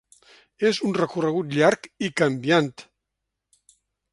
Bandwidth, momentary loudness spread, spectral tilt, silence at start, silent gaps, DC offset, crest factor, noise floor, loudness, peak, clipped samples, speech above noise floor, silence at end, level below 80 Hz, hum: 11.5 kHz; 7 LU; -5.5 dB/octave; 0.6 s; none; under 0.1%; 20 dB; -82 dBFS; -23 LUFS; -4 dBFS; under 0.1%; 60 dB; 1.3 s; -66 dBFS; none